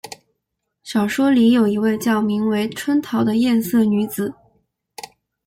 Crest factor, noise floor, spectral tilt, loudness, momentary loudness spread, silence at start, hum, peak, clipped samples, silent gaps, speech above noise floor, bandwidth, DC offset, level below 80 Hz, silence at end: 12 dB; -77 dBFS; -5.5 dB/octave; -18 LUFS; 21 LU; 0.05 s; none; -6 dBFS; under 0.1%; none; 59 dB; 16.5 kHz; under 0.1%; -58 dBFS; 0.4 s